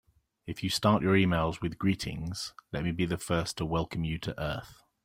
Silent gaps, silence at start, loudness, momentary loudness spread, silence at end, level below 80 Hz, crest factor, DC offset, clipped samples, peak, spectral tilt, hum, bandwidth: none; 0.45 s; -31 LUFS; 12 LU; 0.3 s; -50 dBFS; 20 dB; under 0.1%; under 0.1%; -10 dBFS; -5.5 dB/octave; none; 16.5 kHz